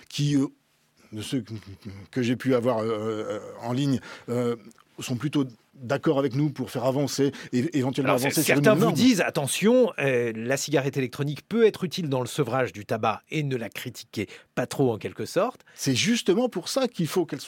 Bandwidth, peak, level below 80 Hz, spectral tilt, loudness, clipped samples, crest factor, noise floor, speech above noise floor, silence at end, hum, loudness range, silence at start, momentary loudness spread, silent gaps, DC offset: 17 kHz; -6 dBFS; -68 dBFS; -5 dB/octave; -25 LUFS; under 0.1%; 20 dB; -61 dBFS; 36 dB; 0 s; none; 6 LU; 0.1 s; 13 LU; none; under 0.1%